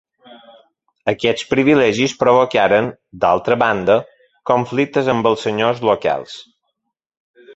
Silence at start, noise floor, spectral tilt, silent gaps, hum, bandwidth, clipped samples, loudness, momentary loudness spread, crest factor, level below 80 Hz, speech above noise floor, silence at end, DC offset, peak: 1.05 s; -75 dBFS; -5.5 dB/octave; 7.17-7.34 s; none; 8.2 kHz; under 0.1%; -16 LUFS; 10 LU; 18 dB; -54 dBFS; 59 dB; 0.05 s; under 0.1%; 0 dBFS